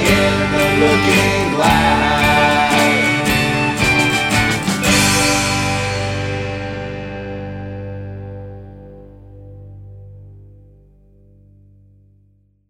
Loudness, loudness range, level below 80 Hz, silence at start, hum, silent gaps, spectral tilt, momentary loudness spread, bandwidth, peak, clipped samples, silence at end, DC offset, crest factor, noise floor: -14 LUFS; 19 LU; -34 dBFS; 0 s; 50 Hz at -40 dBFS; none; -4 dB/octave; 16 LU; 16.5 kHz; 0 dBFS; under 0.1%; 2.3 s; under 0.1%; 16 dB; -55 dBFS